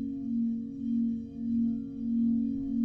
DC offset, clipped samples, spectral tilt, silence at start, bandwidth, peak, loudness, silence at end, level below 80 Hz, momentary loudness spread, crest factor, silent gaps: under 0.1%; under 0.1%; -10.5 dB/octave; 0 s; 0.8 kHz; -20 dBFS; -31 LUFS; 0 s; -56 dBFS; 6 LU; 10 dB; none